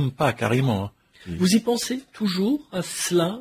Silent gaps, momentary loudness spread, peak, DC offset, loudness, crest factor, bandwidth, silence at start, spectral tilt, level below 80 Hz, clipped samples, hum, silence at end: none; 8 LU; -8 dBFS; under 0.1%; -23 LUFS; 16 dB; 16 kHz; 0 s; -5 dB/octave; -52 dBFS; under 0.1%; none; 0 s